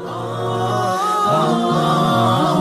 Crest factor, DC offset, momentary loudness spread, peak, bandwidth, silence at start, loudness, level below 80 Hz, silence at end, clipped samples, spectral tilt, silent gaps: 12 dB; under 0.1%; 7 LU; -6 dBFS; 15 kHz; 0 s; -17 LUFS; -52 dBFS; 0 s; under 0.1%; -6 dB/octave; none